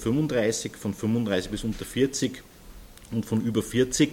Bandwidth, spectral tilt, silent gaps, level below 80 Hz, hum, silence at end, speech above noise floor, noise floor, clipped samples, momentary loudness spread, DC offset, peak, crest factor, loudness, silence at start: 17 kHz; -5 dB/octave; none; -48 dBFS; none; 0 s; 20 dB; -46 dBFS; under 0.1%; 8 LU; under 0.1%; -8 dBFS; 18 dB; -27 LUFS; 0 s